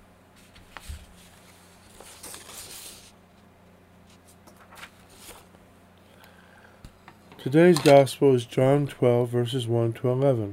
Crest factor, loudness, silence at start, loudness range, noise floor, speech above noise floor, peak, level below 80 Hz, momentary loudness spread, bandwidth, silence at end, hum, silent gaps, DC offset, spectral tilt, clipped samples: 22 dB; -21 LUFS; 0.85 s; 23 LU; -55 dBFS; 34 dB; -4 dBFS; -56 dBFS; 28 LU; 16 kHz; 0 s; none; none; under 0.1%; -6.5 dB/octave; under 0.1%